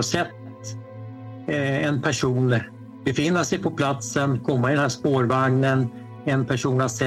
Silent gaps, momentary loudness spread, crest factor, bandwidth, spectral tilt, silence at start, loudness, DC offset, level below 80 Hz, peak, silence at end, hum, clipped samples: none; 16 LU; 18 dB; 13 kHz; -5.5 dB/octave; 0 s; -23 LUFS; under 0.1%; -56 dBFS; -6 dBFS; 0 s; none; under 0.1%